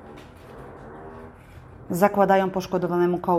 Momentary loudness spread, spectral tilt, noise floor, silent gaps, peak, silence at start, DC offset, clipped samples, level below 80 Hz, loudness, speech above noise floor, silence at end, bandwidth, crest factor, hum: 25 LU; -7 dB/octave; -45 dBFS; none; -4 dBFS; 0 s; under 0.1%; under 0.1%; -54 dBFS; -22 LUFS; 24 dB; 0 s; 15.5 kHz; 20 dB; none